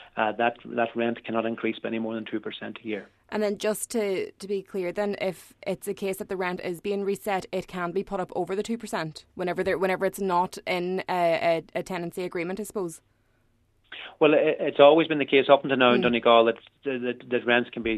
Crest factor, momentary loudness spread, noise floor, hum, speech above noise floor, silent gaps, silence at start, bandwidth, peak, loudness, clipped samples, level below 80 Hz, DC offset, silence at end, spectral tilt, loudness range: 22 dB; 14 LU; -66 dBFS; none; 41 dB; none; 0 s; 14 kHz; -4 dBFS; -26 LUFS; under 0.1%; -62 dBFS; under 0.1%; 0 s; -5 dB/octave; 9 LU